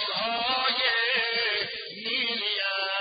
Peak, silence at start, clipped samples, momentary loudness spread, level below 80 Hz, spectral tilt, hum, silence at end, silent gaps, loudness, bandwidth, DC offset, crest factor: -12 dBFS; 0 s; under 0.1%; 6 LU; -68 dBFS; -5.5 dB/octave; none; 0 s; none; -25 LUFS; 5.2 kHz; under 0.1%; 16 dB